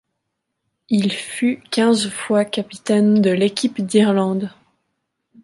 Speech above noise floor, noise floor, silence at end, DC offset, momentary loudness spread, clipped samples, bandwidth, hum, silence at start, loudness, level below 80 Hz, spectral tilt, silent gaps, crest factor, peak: 59 dB; -76 dBFS; 0.95 s; under 0.1%; 7 LU; under 0.1%; 11.5 kHz; none; 0.9 s; -18 LUFS; -66 dBFS; -5.5 dB/octave; none; 16 dB; -4 dBFS